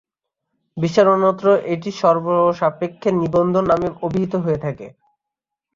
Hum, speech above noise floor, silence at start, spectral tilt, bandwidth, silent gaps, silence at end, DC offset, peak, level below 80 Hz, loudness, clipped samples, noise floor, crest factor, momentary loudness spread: none; 67 dB; 0.75 s; -7.5 dB/octave; 7.6 kHz; none; 0.85 s; under 0.1%; -2 dBFS; -52 dBFS; -18 LUFS; under 0.1%; -84 dBFS; 16 dB; 10 LU